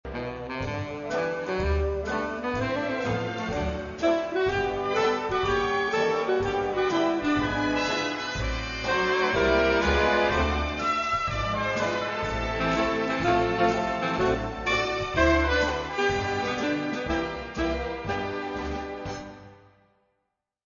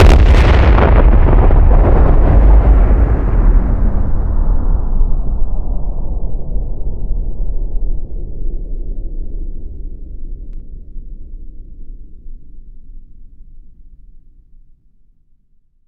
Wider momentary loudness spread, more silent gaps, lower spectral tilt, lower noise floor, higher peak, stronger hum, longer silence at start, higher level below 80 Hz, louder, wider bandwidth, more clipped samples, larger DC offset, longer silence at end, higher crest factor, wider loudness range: second, 9 LU vs 23 LU; neither; second, -5.5 dB/octave vs -8 dB/octave; first, -80 dBFS vs -51 dBFS; second, -8 dBFS vs 0 dBFS; neither; about the same, 0.05 s vs 0 s; second, -38 dBFS vs -14 dBFS; second, -26 LUFS vs -15 LUFS; first, 7.4 kHz vs 6 kHz; neither; neither; second, 1.1 s vs 2.3 s; first, 18 dB vs 12 dB; second, 5 LU vs 23 LU